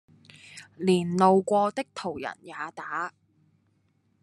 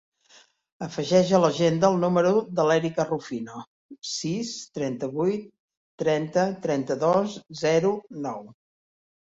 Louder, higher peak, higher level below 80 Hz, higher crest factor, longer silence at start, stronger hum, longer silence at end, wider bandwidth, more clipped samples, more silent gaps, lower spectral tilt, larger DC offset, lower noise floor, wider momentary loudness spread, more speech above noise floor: about the same, -27 LUFS vs -25 LUFS; about the same, -6 dBFS vs -6 dBFS; second, -72 dBFS vs -66 dBFS; about the same, 22 dB vs 20 dB; second, 0.5 s vs 0.8 s; neither; first, 1.15 s vs 0.8 s; first, 11.5 kHz vs 8 kHz; neither; second, none vs 3.67-3.89 s, 5.59-5.68 s, 5.77-5.98 s; about the same, -6 dB/octave vs -5.5 dB/octave; neither; first, -69 dBFS vs -57 dBFS; first, 18 LU vs 13 LU; first, 43 dB vs 33 dB